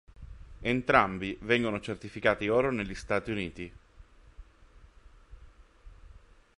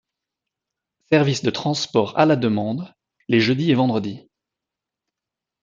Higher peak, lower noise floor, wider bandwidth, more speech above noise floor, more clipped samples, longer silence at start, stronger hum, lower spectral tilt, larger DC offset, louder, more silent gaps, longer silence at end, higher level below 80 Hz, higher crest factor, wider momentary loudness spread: second, -6 dBFS vs -2 dBFS; second, -56 dBFS vs -86 dBFS; first, 11.5 kHz vs 7.8 kHz; second, 27 dB vs 67 dB; neither; second, 0.2 s vs 1.1 s; neither; about the same, -6 dB/octave vs -6 dB/octave; neither; second, -29 LUFS vs -20 LUFS; neither; second, 0.4 s vs 1.45 s; first, -52 dBFS vs -64 dBFS; first, 26 dB vs 20 dB; first, 17 LU vs 12 LU